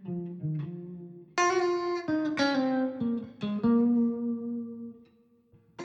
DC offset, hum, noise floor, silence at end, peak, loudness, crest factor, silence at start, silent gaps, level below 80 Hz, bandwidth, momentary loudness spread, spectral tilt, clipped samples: under 0.1%; none; -63 dBFS; 0 s; -16 dBFS; -29 LUFS; 14 dB; 0 s; none; -68 dBFS; 8 kHz; 16 LU; -5.5 dB/octave; under 0.1%